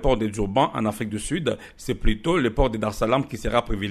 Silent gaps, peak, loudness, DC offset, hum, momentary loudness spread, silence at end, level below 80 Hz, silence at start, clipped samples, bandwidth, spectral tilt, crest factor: none; -6 dBFS; -24 LUFS; under 0.1%; none; 6 LU; 0 s; -30 dBFS; 0 s; under 0.1%; 13.5 kHz; -5.5 dB/octave; 18 dB